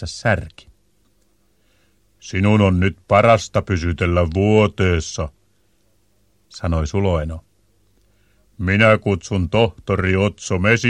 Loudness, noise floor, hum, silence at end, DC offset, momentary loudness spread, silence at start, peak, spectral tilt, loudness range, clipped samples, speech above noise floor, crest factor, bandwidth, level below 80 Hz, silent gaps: -18 LUFS; -62 dBFS; 50 Hz at -40 dBFS; 0 s; under 0.1%; 13 LU; 0 s; 0 dBFS; -6 dB/octave; 8 LU; under 0.1%; 45 dB; 18 dB; 10 kHz; -36 dBFS; none